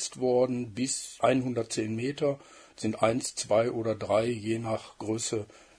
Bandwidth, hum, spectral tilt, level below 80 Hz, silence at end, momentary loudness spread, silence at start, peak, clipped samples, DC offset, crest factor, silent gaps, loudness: 11 kHz; none; -4.5 dB/octave; -66 dBFS; 0.35 s; 8 LU; 0 s; -10 dBFS; under 0.1%; under 0.1%; 20 dB; none; -29 LUFS